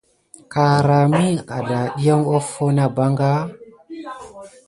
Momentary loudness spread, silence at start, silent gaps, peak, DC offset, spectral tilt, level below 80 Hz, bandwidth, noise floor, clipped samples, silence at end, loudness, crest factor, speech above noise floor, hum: 19 LU; 0.5 s; none; -4 dBFS; under 0.1%; -7 dB/octave; -56 dBFS; 11.5 kHz; -39 dBFS; under 0.1%; 0.2 s; -18 LUFS; 16 dB; 22 dB; none